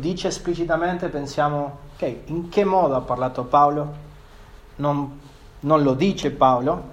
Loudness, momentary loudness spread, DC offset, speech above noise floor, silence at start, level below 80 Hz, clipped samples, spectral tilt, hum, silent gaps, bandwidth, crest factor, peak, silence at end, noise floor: -22 LUFS; 12 LU; under 0.1%; 23 dB; 0 s; -44 dBFS; under 0.1%; -6.5 dB/octave; none; none; 15 kHz; 20 dB; -2 dBFS; 0 s; -44 dBFS